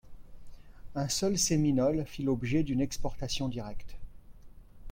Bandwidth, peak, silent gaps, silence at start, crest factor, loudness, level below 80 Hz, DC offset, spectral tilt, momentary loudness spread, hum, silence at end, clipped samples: 16.5 kHz; -16 dBFS; none; 0.05 s; 16 dB; -31 LUFS; -46 dBFS; under 0.1%; -5 dB/octave; 14 LU; none; 0 s; under 0.1%